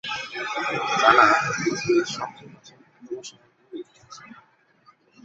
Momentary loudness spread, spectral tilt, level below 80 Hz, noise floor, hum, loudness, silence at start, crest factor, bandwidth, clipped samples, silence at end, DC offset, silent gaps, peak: 26 LU; -3.5 dB/octave; -64 dBFS; -59 dBFS; none; -21 LUFS; 0.05 s; 24 dB; 8 kHz; under 0.1%; 0.9 s; under 0.1%; none; -2 dBFS